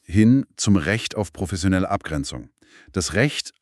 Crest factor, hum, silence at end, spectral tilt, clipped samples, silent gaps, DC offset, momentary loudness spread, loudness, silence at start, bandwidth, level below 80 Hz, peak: 18 dB; none; 0.15 s; -5 dB/octave; under 0.1%; none; under 0.1%; 11 LU; -22 LUFS; 0.1 s; 13 kHz; -42 dBFS; -4 dBFS